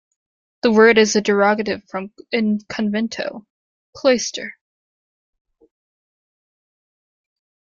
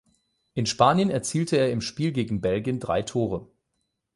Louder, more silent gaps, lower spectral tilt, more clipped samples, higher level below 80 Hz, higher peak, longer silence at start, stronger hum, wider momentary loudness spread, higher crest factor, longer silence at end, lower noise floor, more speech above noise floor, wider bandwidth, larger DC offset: first, -18 LUFS vs -25 LUFS; first, 3.50-3.93 s vs none; second, -4 dB/octave vs -5.5 dB/octave; neither; second, -62 dBFS vs -54 dBFS; about the same, -2 dBFS vs -4 dBFS; about the same, 0.65 s vs 0.55 s; neither; first, 17 LU vs 9 LU; about the same, 20 dB vs 22 dB; first, 3.25 s vs 0.7 s; first, under -90 dBFS vs -78 dBFS; first, over 72 dB vs 53 dB; second, 7.6 kHz vs 11.5 kHz; neither